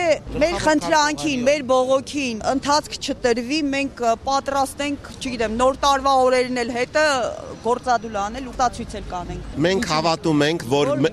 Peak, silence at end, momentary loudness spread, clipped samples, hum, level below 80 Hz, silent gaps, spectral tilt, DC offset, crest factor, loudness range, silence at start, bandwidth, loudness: -4 dBFS; 0 s; 10 LU; under 0.1%; none; -42 dBFS; none; -4 dB/octave; under 0.1%; 16 dB; 3 LU; 0 s; 14 kHz; -21 LUFS